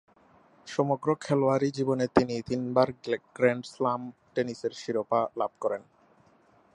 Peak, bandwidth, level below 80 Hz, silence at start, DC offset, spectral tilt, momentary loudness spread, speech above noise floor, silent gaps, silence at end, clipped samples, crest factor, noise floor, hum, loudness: -4 dBFS; 10.5 kHz; -62 dBFS; 0.65 s; under 0.1%; -6.5 dB/octave; 8 LU; 34 dB; none; 0.9 s; under 0.1%; 24 dB; -62 dBFS; none; -29 LUFS